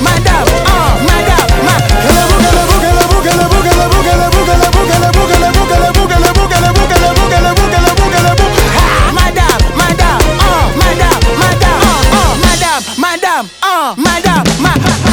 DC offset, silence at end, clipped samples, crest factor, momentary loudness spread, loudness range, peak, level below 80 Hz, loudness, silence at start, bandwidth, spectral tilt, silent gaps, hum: under 0.1%; 0 s; under 0.1%; 8 dB; 2 LU; 1 LU; 0 dBFS; -14 dBFS; -9 LUFS; 0 s; over 20 kHz; -4.5 dB/octave; none; none